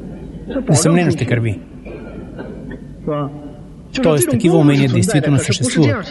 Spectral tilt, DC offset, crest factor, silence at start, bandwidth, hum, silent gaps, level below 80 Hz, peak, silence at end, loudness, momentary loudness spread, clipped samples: -5.5 dB/octave; under 0.1%; 16 dB; 0 s; 12 kHz; none; none; -40 dBFS; 0 dBFS; 0 s; -15 LUFS; 19 LU; under 0.1%